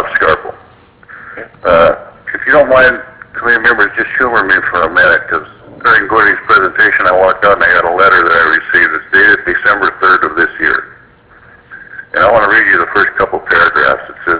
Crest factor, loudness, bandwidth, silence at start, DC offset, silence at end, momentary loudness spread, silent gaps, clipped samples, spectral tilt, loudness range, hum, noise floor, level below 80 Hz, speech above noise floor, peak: 10 dB; -9 LUFS; 4 kHz; 0 s; under 0.1%; 0 s; 11 LU; none; 0.4%; -7.5 dB/octave; 4 LU; none; -41 dBFS; -40 dBFS; 32 dB; 0 dBFS